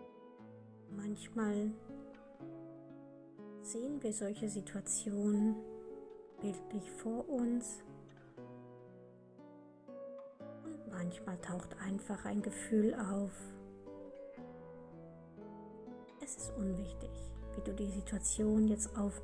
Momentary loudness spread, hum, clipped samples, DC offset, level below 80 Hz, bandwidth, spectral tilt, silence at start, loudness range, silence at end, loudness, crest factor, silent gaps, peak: 22 LU; none; under 0.1%; under 0.1%; -58 dBFS; 10.5 kHz; -5.5 dB/octave; 0 s; 9 LU; 0 s; -40 LUFS; 18 dB; none; -22 dBFS